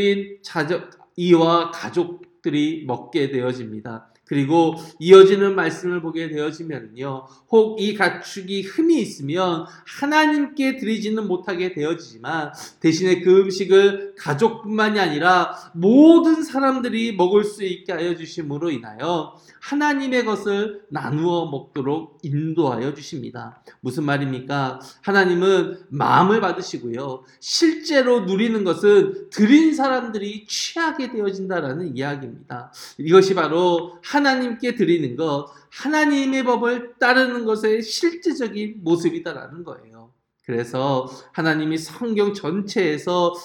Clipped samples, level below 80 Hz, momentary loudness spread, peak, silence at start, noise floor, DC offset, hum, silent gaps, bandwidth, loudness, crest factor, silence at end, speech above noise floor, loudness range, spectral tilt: under 0.1%; -70 dBFS; 15 LU; 0 dBFS; 0 s; -52 dBFS; under 0.1%; none; none; 12 kHz; -20 LUFS; 20 dB; 0 s; 33 dB; 7 LU; -5.5 dB/octave